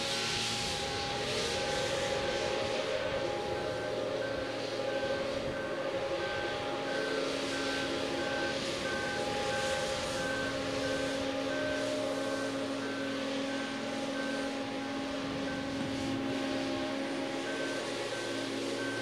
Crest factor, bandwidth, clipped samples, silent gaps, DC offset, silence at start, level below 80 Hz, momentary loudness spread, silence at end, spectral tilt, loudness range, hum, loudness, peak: 14 dB; 15.5 kHz; under 0.1%; none; under 0.1%; 0 s; -58 dBFS; 4 LU; 0 s; -3.5 dB/octave; 2 LU; none; -34 LUFS; -20 dBFS